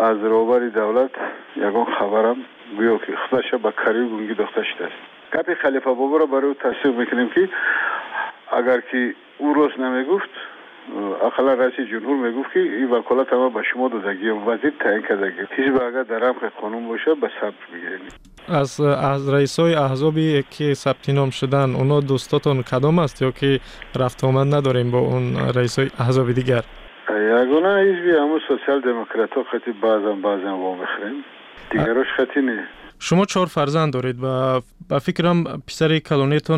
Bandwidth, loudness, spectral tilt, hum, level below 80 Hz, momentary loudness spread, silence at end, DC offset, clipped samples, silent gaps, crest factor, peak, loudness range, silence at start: 13 kHz; -20 LUFS; -6.5 dB/octave; none; -52 dBFS; 9 LU; 0 s; under 0.1%; under 0.1%; none; 12 dB; -8 dBFS; 3 LU; 0 s